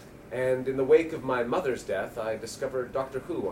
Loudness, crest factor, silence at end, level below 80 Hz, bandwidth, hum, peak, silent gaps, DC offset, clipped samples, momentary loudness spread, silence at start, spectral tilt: -29 LUFS; 20 dB; 0 s; -58 dBFS; 16 kHz; none; -10 dBFS; none; under 0.1%; under 0.1%; 10 LU; 0 s; -5.5 dB/octave